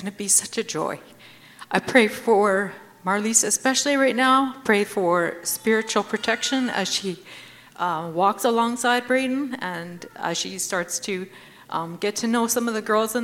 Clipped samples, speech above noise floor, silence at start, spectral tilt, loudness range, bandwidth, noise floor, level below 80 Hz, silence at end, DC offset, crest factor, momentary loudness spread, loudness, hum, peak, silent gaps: under 0.1%; 23 dB; 0 s; -2.5 dB/octave; 6 LU; 17 kHz; -45 dBFS; -70 dBFS; 0 s; under 0.1%; 22 dB; 12 LU; -22 LUFS; none; -2 dBFS; none